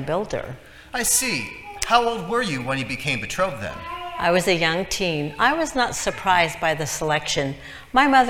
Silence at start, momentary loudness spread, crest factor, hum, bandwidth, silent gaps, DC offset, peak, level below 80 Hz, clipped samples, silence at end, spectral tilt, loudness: 0 s; 12 LU; 22 dB; none; 19 kHz; none; under 0.1%; 0 dBFS; -46 dBFS; under 0.1%; 0 s; -3 dB/octave; -22 LUFS